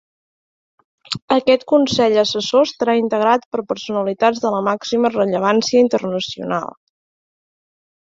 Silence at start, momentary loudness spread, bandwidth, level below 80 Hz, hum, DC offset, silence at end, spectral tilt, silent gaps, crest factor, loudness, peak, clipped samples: 1.1 s; 9 LU; 7.8 kHz; -60 dBFS; none; under 0.1%; 1.45 s; -4.5 dB/octave; 1.22-1.28 s, 3.46-3.52 s; 18 dB; -17 LUFS; 0 dBFS; under 0.1%